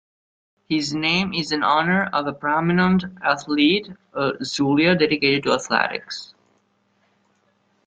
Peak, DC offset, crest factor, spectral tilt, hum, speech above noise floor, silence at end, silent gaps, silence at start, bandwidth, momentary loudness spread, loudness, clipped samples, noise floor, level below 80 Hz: -2 dBFS; under 0.1%; 20 dB; -5 dB/octave; none; 45 dB; 1.6 s; none; 0.7 s; 8.8 kHz; 7 LU; -20 LUFS; under 0.1%; -65 dBFS; -58 dBFS